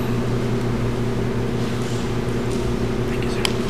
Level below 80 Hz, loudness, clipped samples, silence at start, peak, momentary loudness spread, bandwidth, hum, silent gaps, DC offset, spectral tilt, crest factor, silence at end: -32 dBFS; -23 LUFS; under 0.1%; 0 s; 0 dBFS; 2 LU; 15 kHz; none; none; 3%; -6 dB/octave; 22 dB; 0 s